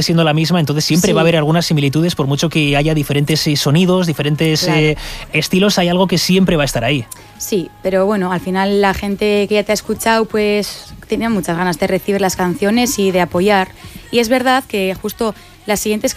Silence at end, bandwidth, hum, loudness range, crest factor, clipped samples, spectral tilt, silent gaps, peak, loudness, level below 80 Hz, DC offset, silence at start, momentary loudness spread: 0 s; 15.5 kHz; none; 3 LU; 14 dB; under 0.1%; -5 dB/octave; none; -2 dBFS; -15 LUFS; -38 dBFS; under 0.1%; 0 s; 7 LU